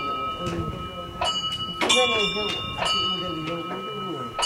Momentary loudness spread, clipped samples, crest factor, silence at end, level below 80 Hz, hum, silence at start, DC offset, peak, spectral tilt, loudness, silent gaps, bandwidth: 12 LU; under 0.1%; 22 dB; 0 s; -48 dBFS; none; 0 s; under 0.1%; -6 dBFS; -2.5 dB/octave; -25 LUFS; none; 16.5 kHz